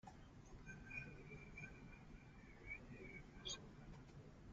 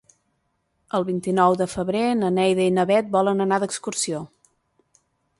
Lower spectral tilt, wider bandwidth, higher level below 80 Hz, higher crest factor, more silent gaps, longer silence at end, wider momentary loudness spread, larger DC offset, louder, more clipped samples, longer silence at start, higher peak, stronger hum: second, -3 dB/octave vs -5 dB/octave; second, 7.6 kHz vs 11.5 kHz; about the same, -64 dBFS vs -60 dBFS; about the same, 20 dB vs 18 dB; neither; second, 0 s vs 1.15 s; first, 11 LU vs 7 LU; neither; second, -56 LUFS vs -22 LUFS; neither; second, 0.05 s vs 0.95 s; second, -38 dBFS vs -4 dBFS; neither